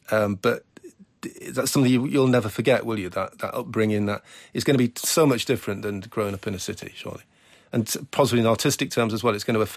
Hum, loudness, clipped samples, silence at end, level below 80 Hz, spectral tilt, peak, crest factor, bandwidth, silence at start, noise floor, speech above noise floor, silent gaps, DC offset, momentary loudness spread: none; -24 LUFS; under 0.1%; 0 s; -54 dBFS; -5 dB/octave; -8 dBFS; 16 dB; 15.5 kHz; 0.1 s; -48 dBFS; 25 dB; none; under 0.1%; 13 LU